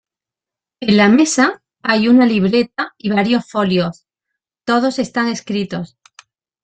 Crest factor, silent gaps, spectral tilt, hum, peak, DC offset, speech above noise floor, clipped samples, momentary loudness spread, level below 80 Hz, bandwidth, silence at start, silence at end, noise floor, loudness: 16 dB; none; -5 dB/octave; none; -2 dBFS; under 0.1%; 73 dB; under 0.1%; 13 LU; -56 dBFS; 9.4 kHz; 0.8 s; 0.8 s; -88 dBFS; -15 LUFS